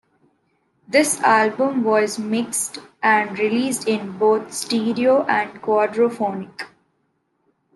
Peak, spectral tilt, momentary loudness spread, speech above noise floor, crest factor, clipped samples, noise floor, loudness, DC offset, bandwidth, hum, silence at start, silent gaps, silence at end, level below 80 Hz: -4 dBFS; -3.5 dB/octave; 9 LU; 49 dB; 18 dB; under 0.1%; -69 dBFS; -19 LUFS; under 0.1%; 12.5 kHz; none; 0.9 s; none; 1.1 s; -70 dBFS